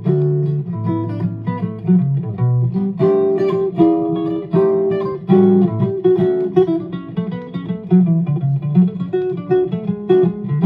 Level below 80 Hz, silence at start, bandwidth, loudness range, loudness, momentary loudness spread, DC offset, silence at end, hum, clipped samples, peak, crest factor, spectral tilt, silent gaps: -56 dBFS; 0 s; 4.8 kHz; 3 LU; -17 LUFS; 9 LU; under 0.1%; 0 s; none; under 0.1%; -2 dBFS; 14 dB; -11.5 dB/octave; none